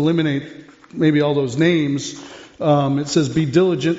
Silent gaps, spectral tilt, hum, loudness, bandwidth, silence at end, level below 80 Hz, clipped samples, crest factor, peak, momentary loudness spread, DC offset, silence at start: none; -6 dB/octave; none; -18 LUFS; 8 kHz; 0 s; -54 dBFS; under 0.1%; 16 dB; -4 dBFS; 17 LU; under 0.1%; 0 s